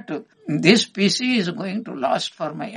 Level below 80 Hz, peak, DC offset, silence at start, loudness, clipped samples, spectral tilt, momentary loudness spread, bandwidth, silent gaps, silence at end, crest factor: -68 dBFS; 0 dBFS; under 0.1%; 0.1 s; -20 LUFS; under 0.1%; -4.5 dB/octave; 13 LU; 11 kHz; none; 0 s; 22 dB